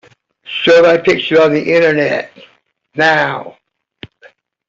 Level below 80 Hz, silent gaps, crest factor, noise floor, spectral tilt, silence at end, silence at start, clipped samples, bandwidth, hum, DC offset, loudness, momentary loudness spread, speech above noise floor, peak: -56 dBFS; none; 12 dB; -46 dBFS; -5 dB/octave; 1.2 s; 0.45 s; under 0.1%; 7.6 kHz; none; under 0.1%; -12 LUFS; 16 LU; 35 dB; -2 dBFS